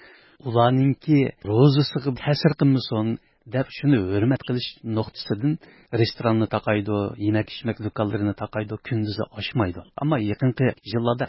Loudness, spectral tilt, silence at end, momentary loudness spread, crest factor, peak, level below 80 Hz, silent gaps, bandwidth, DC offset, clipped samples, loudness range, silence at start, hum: -23 LUFS; -11 dB/octave; 0 s; 10 LU; 20 dB; -4 dBFS; -50 dBFS; none; 5.8 kHz; under 0.1%; under 0.1%; 5 LU; 0.45 s; none